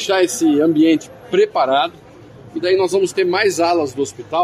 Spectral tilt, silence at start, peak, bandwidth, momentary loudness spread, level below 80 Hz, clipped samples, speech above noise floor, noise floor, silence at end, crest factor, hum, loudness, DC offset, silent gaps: -4 dB/octave; 0 s; -4 dBFS; 14.5 kHz; 8 LU; -58 dBFS; under 0.1%; 24 dB; -40 dBFS; 0 s; 12 dB; none; -16 LUFS; under 0.1%; none